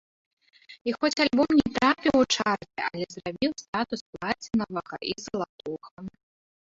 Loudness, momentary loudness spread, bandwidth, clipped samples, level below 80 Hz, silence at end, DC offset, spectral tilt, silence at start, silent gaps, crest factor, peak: -27 LUFS; 14 LU; 7.8 kHz; under 0.1%; -58 dBFS; 0.65 s; under 0.1%; -4 dB/octave; 0.7 s; 0.81-0.85 s, 3.68-3.73 s, 4.01-4.13 s, 5.49-5.58 s, 5.91-5.97 s; 20 dB; -8 dBFS